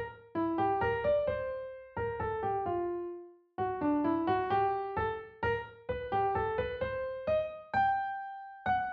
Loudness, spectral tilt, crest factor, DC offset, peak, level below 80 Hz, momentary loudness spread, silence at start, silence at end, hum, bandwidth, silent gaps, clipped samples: -33 LUFS; -5 dB/octave; 14 dB; under 0.1%; -20 dBFS; -54 dBFS; 9 LU; 0 s; 0 s; none; 5.2 kHz; none; under 0.1%